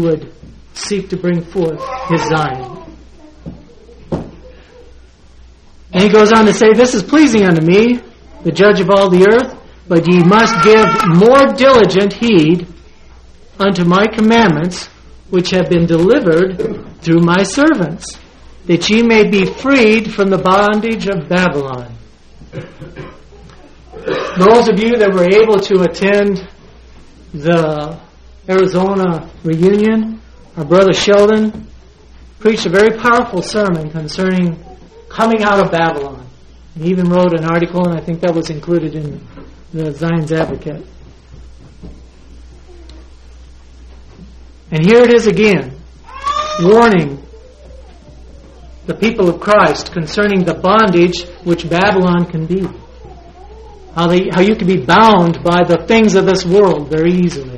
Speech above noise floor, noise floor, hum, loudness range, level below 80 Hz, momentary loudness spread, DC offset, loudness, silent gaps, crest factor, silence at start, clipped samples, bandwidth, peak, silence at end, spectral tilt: 29 dB; -40 dBFS; none; 10 LU; -38 dBFS; 16 LU; under 0.1%; -11 LUFS; none; 12 dB; 0 s; under 0.1%; 11 kHz; 0 dBFS; 0 s; -6 dB/octave